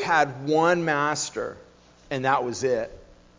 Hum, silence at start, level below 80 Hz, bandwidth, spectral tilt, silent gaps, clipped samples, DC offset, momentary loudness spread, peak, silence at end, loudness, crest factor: 60 Hz at -60 dBFS; 0 s; -58 dBFS; 7.6 kHz; -4 dB/octave; none; under 0.1%; under 0.1%; 12 LU; -6 dBFS; 0.35 s; -24 LUFS; 18 dB